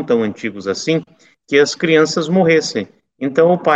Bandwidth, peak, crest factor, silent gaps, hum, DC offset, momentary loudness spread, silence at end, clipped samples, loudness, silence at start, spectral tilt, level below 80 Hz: 8.4 kHz; 0 dBFS; 14 dB; none; none; under 0.1%; 11 LU; 0 s; under 0.1%; -16 LUFS; 0 s; -5 dB/octave; -62 dBFS